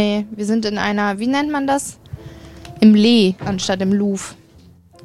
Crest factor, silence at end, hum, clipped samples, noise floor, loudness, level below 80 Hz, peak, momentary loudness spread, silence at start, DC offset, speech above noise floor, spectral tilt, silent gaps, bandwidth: 16 dB; 0.7 s; none; under 0.1%; -47 dBFS; -17 LUFS; -48 dBFS; -2 dBFS; 24 LU; 0 s; 0.2%; 30 dB; -5 dB/octave; none; 12.5 kHz